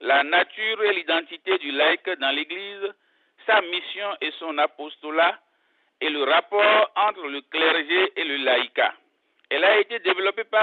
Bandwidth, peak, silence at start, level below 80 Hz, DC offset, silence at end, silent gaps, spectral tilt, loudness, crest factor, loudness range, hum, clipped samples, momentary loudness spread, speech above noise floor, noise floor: 4.6 kHz; -8 dBFS; 0 s; -82 dBFS; under 0.1%; 0 s; none; -3.5 dB/octave; -22 LUFS; 16 dB; 4 LU; none; under 0.1%; 11 LU; 44 dB; -67 dBFS